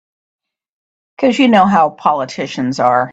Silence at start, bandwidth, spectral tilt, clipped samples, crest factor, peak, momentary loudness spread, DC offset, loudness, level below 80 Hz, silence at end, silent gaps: 1.2 s; 8 kHz; -5.5 dB/octave; under 0.1%; 14 dB; 0 dBFS; 10 LU; under 0.1%; -13 LUFS; -58 dBFS; 0 s; none